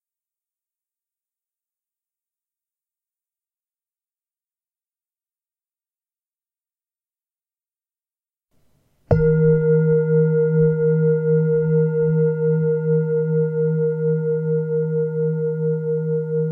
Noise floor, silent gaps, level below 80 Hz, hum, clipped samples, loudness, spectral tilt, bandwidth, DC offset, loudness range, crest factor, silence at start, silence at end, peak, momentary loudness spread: under -90 dBFS; none; -48 dBFS; none; under 0.1%; -19 LUFS; -13.5 dB/octave; 2.2 kHz; under 0.1%; 4 LU; 20 dB; 9.1 s; 0 s; -2 dBFS; 5 LU